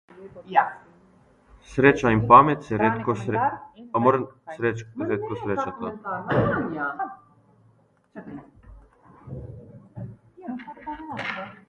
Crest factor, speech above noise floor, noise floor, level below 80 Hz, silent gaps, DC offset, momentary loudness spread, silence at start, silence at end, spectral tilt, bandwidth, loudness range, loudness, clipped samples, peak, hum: 24 dB; 38 dB; -61 dBFS; -52 dBFS; none; under 0.1%; 23 LU; 0.15 s; 0.15 s; -7.5 dB/octave; 10 kHz; 20 LU; -23 LUFS; under 0.1%; 0 dBFS; none